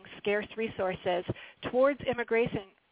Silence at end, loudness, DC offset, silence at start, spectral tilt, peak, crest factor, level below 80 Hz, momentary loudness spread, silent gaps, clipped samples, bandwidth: 0.25 s; -31 LUFS; under 0.1%; 0.05 s; -9 dB/octave; -14 dBFS; 18 dB; -60 dBFS; 10 LU; none; under 0.1%; 4 kHz